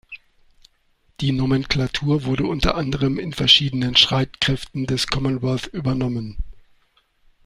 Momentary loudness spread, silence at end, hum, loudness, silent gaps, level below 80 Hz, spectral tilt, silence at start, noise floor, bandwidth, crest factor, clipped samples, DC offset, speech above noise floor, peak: 13 LU; 0.85 s; none; -20 LUFS; none; -36 dBFS; -5 dB/octave; 0.1 s; -62 dBFS; 13.5 kHz; 22 dB; under 0.1%; under 0.1%; 42 dB; 0 dBFS